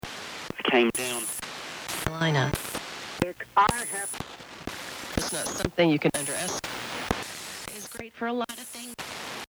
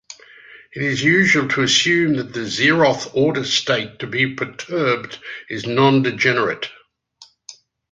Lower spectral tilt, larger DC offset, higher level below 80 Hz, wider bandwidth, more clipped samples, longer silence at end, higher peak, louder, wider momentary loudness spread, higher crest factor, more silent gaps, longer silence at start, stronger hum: about the same, -3.5 dB/octave vs -4 dB/octave; neither; first, -50 dBFS vs -58 dBFS; first, over 20 kHz vs 9.4 kHz; neither; second, 0.05 s vs 0.4 s; second, -8 dBFS vs -2 dBFS; second, -29 LUFS vs -17 LUFS; about the same, 14 LU vs 14 LU; about the same, 22 dB vs 18 dB; neither; about the same, 0.05 s vs 0.1 s; neither